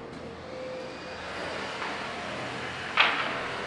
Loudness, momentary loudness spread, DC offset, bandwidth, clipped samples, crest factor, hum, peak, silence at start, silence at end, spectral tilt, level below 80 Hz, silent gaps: -30 LUFS; 15 LU; under 0.1%; 11.5 kHz; under 0.1%; 26 dB; none; -8 dBFS; 0 s; 0 s; -3 dB/octave; -62 dBFS; none